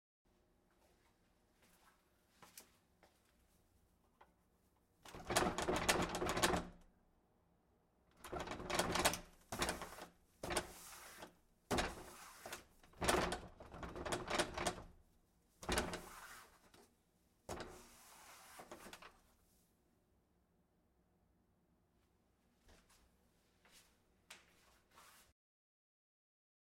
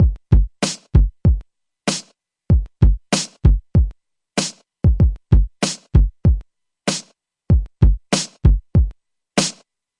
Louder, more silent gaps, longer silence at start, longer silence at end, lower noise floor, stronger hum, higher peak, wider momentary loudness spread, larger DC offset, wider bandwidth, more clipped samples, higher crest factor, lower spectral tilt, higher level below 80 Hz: second, -41 LUFS vs -19 LUFS; neither; first, 2.4 s vs 0 s; first, 1.55 s vs 0.5 s; first, -78 dBFS vs -51 dBFS; neither; second, -16 dBFS vs 0 dBFS; first, 23 LU vs 9 LU; neither; first, 16 kHz vs 11.5 kHz; neither; first, 30 dB vs 16 dB; second, -3 dB/octave vs -5 dB/octave; second, -60 dBFS vs -20 dBFS